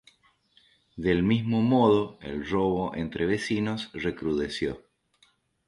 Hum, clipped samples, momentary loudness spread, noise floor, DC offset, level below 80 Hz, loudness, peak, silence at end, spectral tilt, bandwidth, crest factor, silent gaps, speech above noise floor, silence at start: none; under 0.1%; 11 LU; -66 dBFS; under 0.1%; -52 dBFS; -27 LUFS; -10 dBFS; 0.9 s; -7 dB/octave; 11.5 kHz; 18 dB; none; 40 dB; 0.95 s